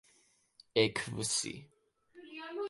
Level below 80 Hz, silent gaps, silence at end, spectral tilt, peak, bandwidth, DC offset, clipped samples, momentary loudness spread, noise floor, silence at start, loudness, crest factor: -70 dBFS; none; 0 s; -3 dB/octave; -12 dBFS; 11.5 kHz; under 0.1%; under 0.1%; 18 LU; -70 dBFS; 0.75 s; -34 LUFS; 26 dB